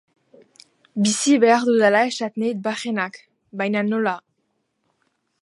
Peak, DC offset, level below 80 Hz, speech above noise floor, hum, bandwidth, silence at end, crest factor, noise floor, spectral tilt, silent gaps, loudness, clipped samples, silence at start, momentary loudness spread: -4 dBFS; under 0.1%; -76 dBFS; 52 dB; none; 11.5 kHz; 1.25 s; 18 dB; -72 dBFS; -4 dB/octave; none; -20 LUFS; under 0.1%; 0.95 s; 13 LU